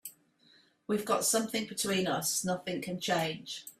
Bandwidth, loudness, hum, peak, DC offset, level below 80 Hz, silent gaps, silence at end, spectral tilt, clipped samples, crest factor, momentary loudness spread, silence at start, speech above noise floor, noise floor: 16 kHz; -32 LUFS; none; -16 dBFS; under 0.1%; -72 dBFS; none; 0.1 s; -3 dB/octave; under 0.1%; 18 dB; 12 LU; 0.05 s; 32 dB; -65 dBFS